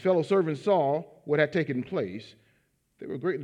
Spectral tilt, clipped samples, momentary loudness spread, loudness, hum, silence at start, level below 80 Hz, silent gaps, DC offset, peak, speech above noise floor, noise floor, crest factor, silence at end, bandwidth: -7.5 dB/octave; under 0.1%; 13 LU; -27 LUFS; none; 0 s; -74 dBFS; none; under 0.1%; -8 dBFS; 43 dB; -70 dBFS; 20 dB; 0 s; 10 kHz